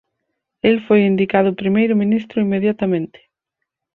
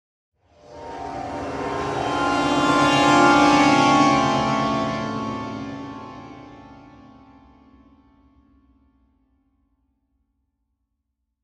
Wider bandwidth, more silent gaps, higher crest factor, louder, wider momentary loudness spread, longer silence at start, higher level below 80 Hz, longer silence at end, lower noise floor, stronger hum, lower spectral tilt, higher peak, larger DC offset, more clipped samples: second, 4.3 kHz vs 11.5 kHz; neither; about the same, 16 dB vs 20 dB; about the same, -17 LUFS vs -19 LUFS; second, 6 LU vs 22 LU; about the same, 0.65 s vs 0.7 s; second, -58 dBFS vs -50 dBFS; second, 0.9 s vs 4.7 s; about the same, -79 dBFS vs -77 dBFS; neither; first, -9.5 dB/octave vs -4.5 dB/octave; about the same, -2 dBFS vs -4 dBFS; neither; neither